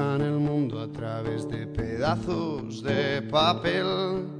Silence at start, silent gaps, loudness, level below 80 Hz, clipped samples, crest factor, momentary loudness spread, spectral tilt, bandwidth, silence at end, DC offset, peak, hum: 0 s; none; -27 LUFS; -48 dBFS; under 0.1%; 18 dB; 9 LU; -6.5 dB/octave; 10.5 kHz; 0 s; under 0.1%; -10 dBFS; none